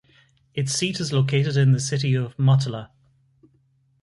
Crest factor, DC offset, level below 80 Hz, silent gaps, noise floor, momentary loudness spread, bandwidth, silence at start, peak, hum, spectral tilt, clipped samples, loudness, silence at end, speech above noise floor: 16 dB; under 0.1%; -60 dBFS; none; -63 dBFS; 10 LU; 11.5 kHz; 0.55 s; -8 dBFS; none; -5.5 dB/octave; under 0.1%; -22 LUFS; 1.15 s; 42 dB